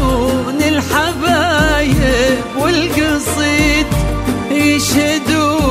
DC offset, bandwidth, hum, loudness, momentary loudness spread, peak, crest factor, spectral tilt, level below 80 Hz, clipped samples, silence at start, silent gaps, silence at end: under 0.1%; 16 kHz; none; -13 LUFS; 4 LU; 0 dBFS; 12 dB; -4.5 dB/octave; -24 dBFS; under 0.1%; 0 s; none; 0 s